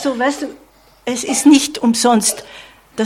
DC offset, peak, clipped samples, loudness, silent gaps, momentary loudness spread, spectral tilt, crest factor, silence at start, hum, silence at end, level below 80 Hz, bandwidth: under 0.1%; 0 dBFS; under 0.1%; -14 LUFS; none; 17 LU; -2.5 dB/octave; 16 dB; 0 s; none; 0 s; -56 dBFS; 16 kHz